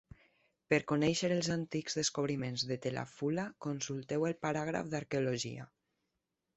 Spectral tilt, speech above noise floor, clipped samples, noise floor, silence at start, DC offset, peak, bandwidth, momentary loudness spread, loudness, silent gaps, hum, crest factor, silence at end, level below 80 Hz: -4.5 dB/octave; 51 dB; under 0.1%; -86 dBFS; 0.7 s; under 0.1%; -14 dBFS; 8.2 kHz; 8 LU; -35 LUFS; none; none; 22 dB; 0.9 s; -68 dBFS